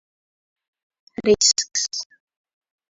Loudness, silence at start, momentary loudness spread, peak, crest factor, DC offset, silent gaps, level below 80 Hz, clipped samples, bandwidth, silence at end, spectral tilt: -19 LUFS; 1.2 s; 21 LU; -4 dBFS; 22 dB; under 0.1%; none; -56 dBFS; under 0.1%; 8 kHz; 0.85 s; -1.5 dB/octave